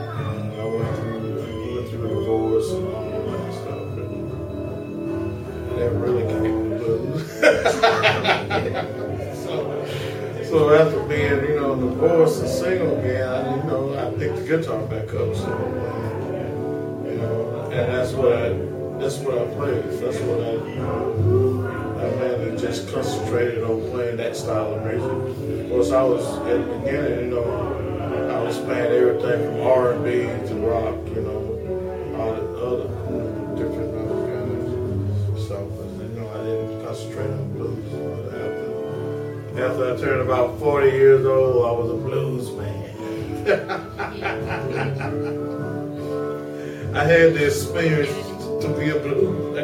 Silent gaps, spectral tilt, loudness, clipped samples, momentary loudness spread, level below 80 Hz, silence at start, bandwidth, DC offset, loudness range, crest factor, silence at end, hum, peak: none; -6.5 dB/octave; -23 LUFS; under 0.1%; 11 LU; -46 dBFS; 0 s; 16.5 kHz; under 0.1%; 7 LU; 20 dB; 0 s; none; -2 dBFS